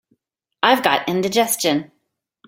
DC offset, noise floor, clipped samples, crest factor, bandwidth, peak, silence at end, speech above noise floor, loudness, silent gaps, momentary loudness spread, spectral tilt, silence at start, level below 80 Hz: under 0.1%; -72 dBFS; under 0.1%; 20 dB; 17 kHz; -2 dBFS; 0.6 s; 55 dB; -18 LUFS; none; 5 LU; -3 dB/octave; 0.65 s; -64 dBFS